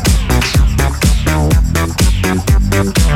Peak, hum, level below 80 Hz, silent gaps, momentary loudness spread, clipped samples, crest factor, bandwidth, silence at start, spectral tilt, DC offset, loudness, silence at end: -2 dBFS; none; -14 dBFS; none; 1 LU; under 0.1%; 10 dB; 16.5 kHz; 0 s; -5 dB/octave; under 0.1%; -13 LUFS; 0 s